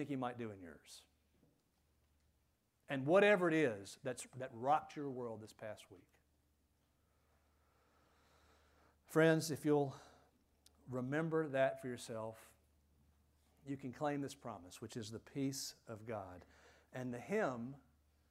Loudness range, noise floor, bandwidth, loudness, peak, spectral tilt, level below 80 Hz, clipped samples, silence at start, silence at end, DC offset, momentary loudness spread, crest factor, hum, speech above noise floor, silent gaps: 11 LU; -80 dBFS; 16 kHz; -39 LUFS; -18 dBFS; -5.5 dB/octave; -78 dBFS; under 0.1%; 0 s; 0.5 s; under 0.1%; 20 LU; 22 dB; none; 41 dB; none